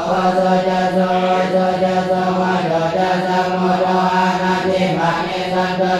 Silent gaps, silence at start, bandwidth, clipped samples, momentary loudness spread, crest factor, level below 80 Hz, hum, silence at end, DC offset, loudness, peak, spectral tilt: none; 0 s; 12 kHz; under 0.1%; 2 LU; 12 dB; -50 dBFS; none; 0 s; under 0.1%; -16 LUFS; -4 dBFS; -6 dB/octave